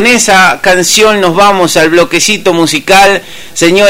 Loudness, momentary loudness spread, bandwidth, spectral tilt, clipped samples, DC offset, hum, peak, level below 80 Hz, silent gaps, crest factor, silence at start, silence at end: -6 LUFS; 4 LU; over 20 kHz; -2.5 dB/octave; 3%; under 0.1%; none; 0 dBFS; -38 dBFS; none; 6 dB; 0 s; 0 s